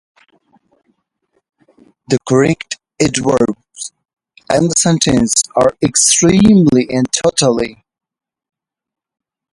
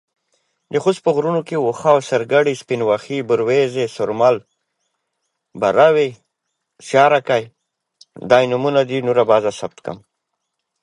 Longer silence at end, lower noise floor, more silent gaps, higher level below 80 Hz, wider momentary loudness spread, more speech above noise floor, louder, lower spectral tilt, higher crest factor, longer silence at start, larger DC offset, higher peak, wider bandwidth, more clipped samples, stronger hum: first, 1.8 s vs 0.85 s; second, -66 dBFS vs -76 dBFS; neither; first, -44 dBFS vs -64 dBFS; first, 14 LU vs 11 LU; second, 54 dB vs 60 dB; first, -12 LUFS vs -17 LUFS; second, -4 dB/octave vs -5.5 dB/octave; about the same, 16 dB vs 18 dB; first, 2.1 s vs 0.7 s; neither; about the same, 0 dBFS vs 0 dBFS; about the same, 11.5 kHz vs 11.5 kHz; neither; neither